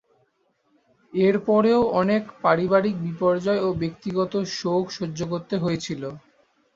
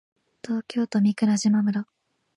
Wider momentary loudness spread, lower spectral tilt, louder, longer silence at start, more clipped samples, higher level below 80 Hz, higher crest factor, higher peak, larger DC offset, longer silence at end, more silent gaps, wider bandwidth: second, 10 LU vs 13 LU; about the same, -6.5 dB/octave vs -5.5 dB/octave; about the same, -23 LUFS vs -24 LUFS; first, 1.15 s vs 0.45 s; neither; first, -56 dBFS vs -74 dBFS; first, 20 dB vs 12 dB; first, -4 dBFS vs -12 dBFS; neither; about the same, 0.6 s vs 0.55 s; neither; second, 7.8 kHz vs 10.5 kHz